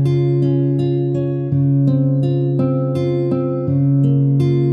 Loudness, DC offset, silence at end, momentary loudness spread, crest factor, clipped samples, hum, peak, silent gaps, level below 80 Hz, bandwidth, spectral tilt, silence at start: -17 LUFS; under 0.1%; 0 s; 4 LU; 10 dB; under 0.1%; none; -4 dBFS; none; -56 dBFS; 4.8 kHz; -11 dB/octave; 0 s